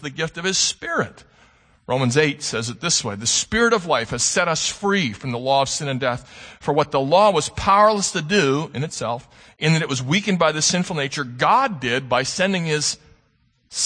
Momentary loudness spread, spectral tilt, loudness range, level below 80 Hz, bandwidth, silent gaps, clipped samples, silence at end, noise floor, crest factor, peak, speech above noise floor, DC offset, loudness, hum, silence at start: 9 LU; -3.5 dB/octave; 2 LU; -50 dBFS; 9.8 kHz; none; under 0.1%; 0 s; -63 dBFS; 20 dB; -2 dBFS; 42 dB; under 0.1%; -20 LUFS; none; 0 s